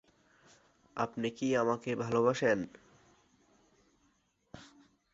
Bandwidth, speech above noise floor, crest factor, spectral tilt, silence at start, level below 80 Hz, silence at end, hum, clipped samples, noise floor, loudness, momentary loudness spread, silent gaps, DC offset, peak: 7.8 kHz; 42 dB; 22 dB; -5.5 dB/octave; 0.95 s; -72 dBFS; 0.5 s; none; under 0.1%; -74 dBFS; -32 LUFS; 23 LU; none; under 0.1%; -14 dBFS